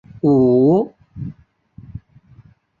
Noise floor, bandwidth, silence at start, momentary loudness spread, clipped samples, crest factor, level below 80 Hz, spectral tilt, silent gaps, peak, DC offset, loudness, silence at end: -49 dBFS; 4.4 kHz; 0.25 s; 25 LU; under 0.1%; 14 dB; -50 dBFS; -12 dB/octave; none; -4 dBFS; under 0.1%; -15 LUFS; 0.8 s